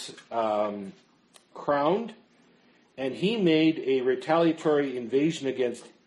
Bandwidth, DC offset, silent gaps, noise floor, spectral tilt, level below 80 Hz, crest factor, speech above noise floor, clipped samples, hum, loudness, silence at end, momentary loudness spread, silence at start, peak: 11 kHz; under 0.1%; none; -61 dBFS; -6 dB/octave; -74 dBFS; 16 dB; 35 dB; under 0.1%; none; -26 LUFS; 0.2 s; 11 LU; 0 s; -10 dBFS